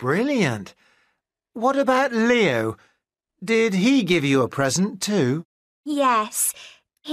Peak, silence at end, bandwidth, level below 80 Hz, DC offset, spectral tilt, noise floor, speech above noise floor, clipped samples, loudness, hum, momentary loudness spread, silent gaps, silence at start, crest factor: -8 dBFS; 0 s; 15.5 kHz; -64 dBFS; under 0.1%; -4.5 dB/octave; -74 dBFS; 54 dB; under 0.1%; -21 LUFS; none; 16 LU; 5.45-5.84 s; 0 s; 14 dB